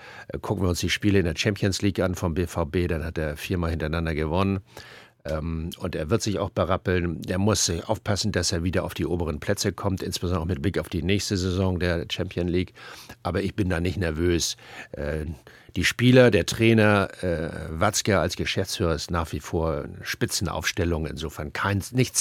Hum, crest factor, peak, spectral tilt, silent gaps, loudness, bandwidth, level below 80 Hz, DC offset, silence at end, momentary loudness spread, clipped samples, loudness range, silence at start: none; 22 dB; -2 dBFS; -5 dB/octave; none; -25 LUFS; 16.5 kHz; -40 dBFS; under 0.1%; 0 s; 11 LU; under 0.1%; 6 LU; 0 s